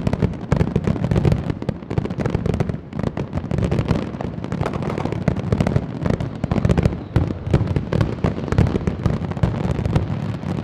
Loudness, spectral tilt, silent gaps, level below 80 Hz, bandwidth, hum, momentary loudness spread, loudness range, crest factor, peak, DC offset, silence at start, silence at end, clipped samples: -22 LUFS; -8.5 dB/octave; none; -30 dBFS; 10.5 kHz; none; 6 LU; 3 LU; 20 dB; 0 dBFS; under 0.1%; 0 s; 0 s; under 0.1%